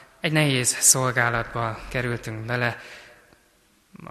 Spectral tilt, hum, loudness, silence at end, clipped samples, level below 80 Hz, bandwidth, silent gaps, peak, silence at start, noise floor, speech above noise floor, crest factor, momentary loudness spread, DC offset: -3 dB/octave; none; -22 LUFS; 0 s; under 0.1%; -50 dBFS; 13 kHz; none; -4 dBFS; 0.25 s; -61 dBFS; 38 dB; 22 dB; 13 LU; under 0.1%